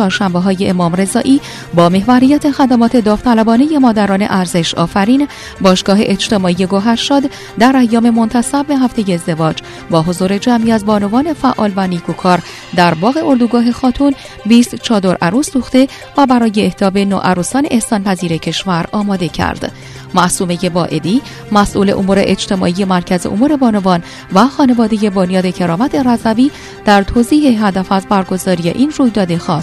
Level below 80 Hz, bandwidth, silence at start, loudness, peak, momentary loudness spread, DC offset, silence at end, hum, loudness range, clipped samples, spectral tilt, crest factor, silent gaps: -38 dBFS; 13 kHz; 0 s; -12 LUFS; 0 dBFS; 6 LU; under 0.1%; 0 s; none; 3 LU; 0.2%; -5.5 dB/octave; 12 dB; none